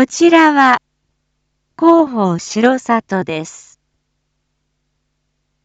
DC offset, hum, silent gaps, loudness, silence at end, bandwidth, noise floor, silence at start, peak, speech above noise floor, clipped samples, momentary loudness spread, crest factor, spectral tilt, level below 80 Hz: under 0.1%; none; none; -13 LUFS; 2.05 s; 8 kHz; -69 dBFS; 0 s; 0 dBFS; 57 dB; under 0.1%; 12 LU; 14 dB; -5 dB/octave; -62 dBFS